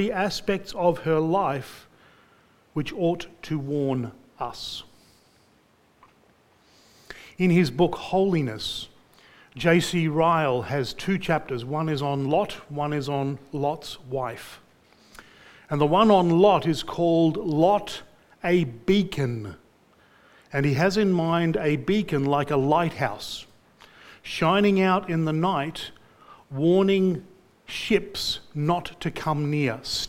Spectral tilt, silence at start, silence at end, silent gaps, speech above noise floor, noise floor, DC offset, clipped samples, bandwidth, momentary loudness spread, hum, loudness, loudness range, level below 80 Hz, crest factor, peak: -6 dB/octave; 0 s; 0 s; none; 37 dB; -61 dBFS; under 0.1%; under 0.1%; 16 kHz; 15 LU; none; -24 LUFS; 9 LU; -54 dBFS; 20 dB; -6 dBFS